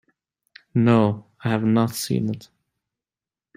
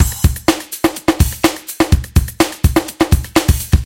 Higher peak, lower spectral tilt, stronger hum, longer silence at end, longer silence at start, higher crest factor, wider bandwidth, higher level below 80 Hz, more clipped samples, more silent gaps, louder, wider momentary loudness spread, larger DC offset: second, -4 dBFS vs 0 dBFS; first, -6.5 dB/octave vs -5 dB/octave; neither; first, 1.15 s vs 0 s; first, 0.75 s vs 0 s; first, 20 dB vs 14 dB; about the same, 16 kHz vs 17.5 kHz; second, -60 dBFS vs -20 dBFS; neither; neither; second, -22 LUFS vs -16 LUFS; first, 11 LU vs 4 LU; neither